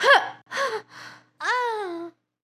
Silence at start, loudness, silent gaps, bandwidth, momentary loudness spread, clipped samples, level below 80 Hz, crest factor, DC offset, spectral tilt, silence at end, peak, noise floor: 0 s; -25 LUFS; none; 15.5 kHz; 24 LU; under 0.1%; -88 dBFS; 22 dB; under 0.1%; -1 dB/octave; 0.35 s; -4 dBFS; -45 dBFS